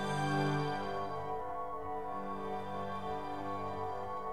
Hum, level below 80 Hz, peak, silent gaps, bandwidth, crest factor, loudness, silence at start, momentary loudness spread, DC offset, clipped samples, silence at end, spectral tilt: none; -60 dBFS; -22 dBFS; none; 15 kHz; 16 dB; -38 LUFS; 0 s; 7 LU; 0.5%; under 0.1%; 0 s; -6.5 dB/octave